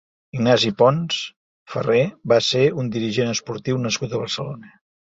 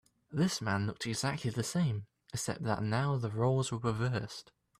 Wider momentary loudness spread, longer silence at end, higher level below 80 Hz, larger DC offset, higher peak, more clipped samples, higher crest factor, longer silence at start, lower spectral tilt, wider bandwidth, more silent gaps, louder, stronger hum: first, 13 LU vs 9 LU; about the same, 0.45 s vs 0.35 s; first, -58 dBFS vs -64 dBFS; neither; first, -2 dBFS vs -18 dBFS; neither; about the same, 18 dB vs 16 dB; about the same, 0.35 s vs 0.3 s; about the same, -5 dB/octave vs -5.5 dB/octave; second, 7.8 kHz vs 14.5 kHz; first, 1.36-1.66 s vs none; first, -20 LUFS vs -34 LUFS; neither